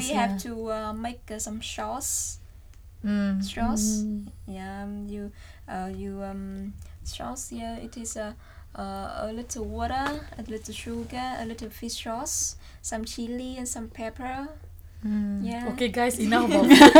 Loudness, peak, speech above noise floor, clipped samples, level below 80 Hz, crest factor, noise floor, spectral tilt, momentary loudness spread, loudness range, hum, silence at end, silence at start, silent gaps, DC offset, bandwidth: -28 LUFS; -2 dBFS; 22 dB; under 0.1%; -44 dBFS; 24 dB; -47 dBFS; -3.5 dB/octave; 13 LU; 7 LU; none; 0 s; 0 s; none; under 0.1%; 19.5 kHz